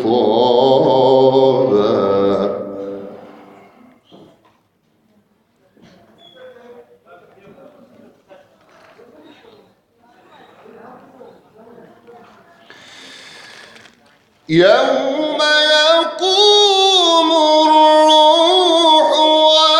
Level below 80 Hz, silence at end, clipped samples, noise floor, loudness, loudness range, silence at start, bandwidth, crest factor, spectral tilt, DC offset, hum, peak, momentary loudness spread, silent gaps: -62 dBFS; 0 s; under 0.1%; -60 dBFS; -11 LUFS; 13 LU; 0 s; 11.5 kHz; 16 dB; -3.5 dB/octave; under 0.1%; none; 0 dBFS; 10 LU; none